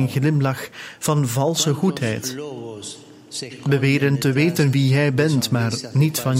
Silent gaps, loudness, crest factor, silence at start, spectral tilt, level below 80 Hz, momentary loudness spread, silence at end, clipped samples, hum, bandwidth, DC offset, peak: none; -20 LUFS; 16 dB; 0 s; -5.5 dB/octave; -58 dBFS; 15 LU; 0 s; under 0.1%; none; 16 kHz; under 0.1%; -4 dBFS